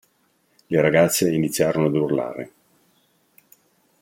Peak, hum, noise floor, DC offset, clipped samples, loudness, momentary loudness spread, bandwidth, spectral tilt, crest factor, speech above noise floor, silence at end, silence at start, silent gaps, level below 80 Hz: -4 dBFS; none; -65 dBFS; under 0.1%; under 0.1%; -20 LUFS; 14 LU; 16.5 kHz; -5 dB/octave; 20 dB; 45 dB; 1.55 s; 0.7 s; none; -60 dBFS